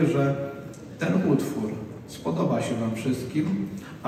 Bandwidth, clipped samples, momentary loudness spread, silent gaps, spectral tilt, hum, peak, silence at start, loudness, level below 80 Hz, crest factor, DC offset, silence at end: 15.5 kHz; under 0.1%; 13 LU; none; -7 dB/octave; none; -10 dBFS; 0 s; -27 LUFS; -58 dBFS; 16 dB; under 0.1%; 0 s